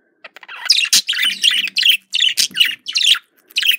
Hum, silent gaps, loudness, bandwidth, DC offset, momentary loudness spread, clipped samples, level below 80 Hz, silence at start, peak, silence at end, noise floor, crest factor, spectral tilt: none; none; -13 LUFS; 16.5 kHz; under 0.1%; 5 LU; under 0.1%; -70 dBFS; 0.25 s; 0 dBFS; 0 s; -41 dBFS; 18 dB; 4 dB/octave